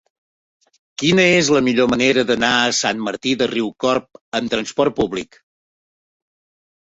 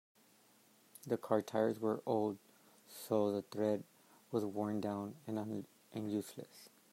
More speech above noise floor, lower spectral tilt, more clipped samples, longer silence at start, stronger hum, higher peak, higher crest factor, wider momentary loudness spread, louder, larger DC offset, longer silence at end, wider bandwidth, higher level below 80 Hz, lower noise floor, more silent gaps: first, over 73 dB vs 30 dB; second, -3.5 dB/octave vs -6.5 dB/octave; neither; about the same, 1 s vs 1.05 s; neither; first, -2 dBFS vs -18 dBFS; about the same, 18 dB vs 22 dB; second, 10 LU vs 17 LU; first, -17 LUFS vs -39 LUFS; neither; first, 1.6 s vs 0.25 s; second, 8.2 kHz vs 16 kHz; first, -52 dBFS vs -84 dBFS; first, under -90 dBFS vs -68 dBFS; first, 4.21-4.32 s vs none